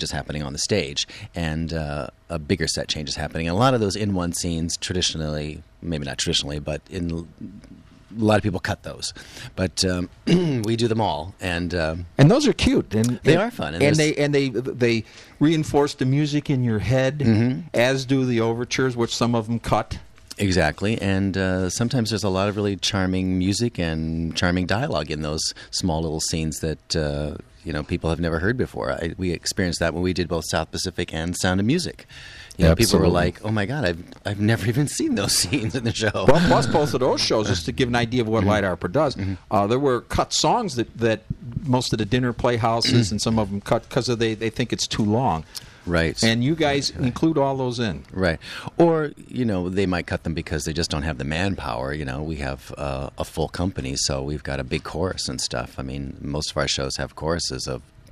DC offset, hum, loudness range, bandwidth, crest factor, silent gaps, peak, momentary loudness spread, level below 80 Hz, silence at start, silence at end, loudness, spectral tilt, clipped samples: under 0.1%; none; 6 LU; 14.5 kHz; 20 dB; none; -2 dBFS; 10 LU; -40 dBFS; 0 s; 0.3 s; -23 LUFS; -5 dB/octave; under 0.1%